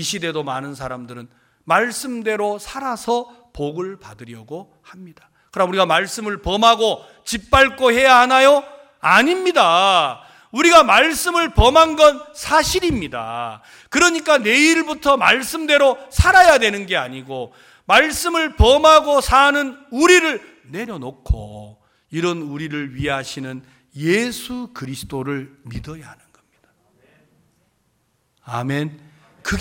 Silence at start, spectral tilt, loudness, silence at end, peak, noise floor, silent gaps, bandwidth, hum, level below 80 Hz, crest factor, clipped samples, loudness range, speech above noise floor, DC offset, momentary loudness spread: 0 s; -3.5 dB/octave; -16 LUFS; 0 s; 0 dBFS; -65 dBFS; none; 17 kHz; none; -32 dBFS; 18 dB; under 0.1%; 13 LU; 49 dB; under 0.1%; 19 LU